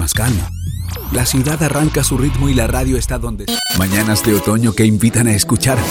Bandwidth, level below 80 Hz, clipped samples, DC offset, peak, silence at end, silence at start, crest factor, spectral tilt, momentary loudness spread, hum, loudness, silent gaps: 17 kHz; -26 dBFS; under 0.1%; under 0.1%; -2 dBFS; 0 s; 0 s; 14 dB; -4.5 dB/octave; 8 LU; none; -15 LUFS; none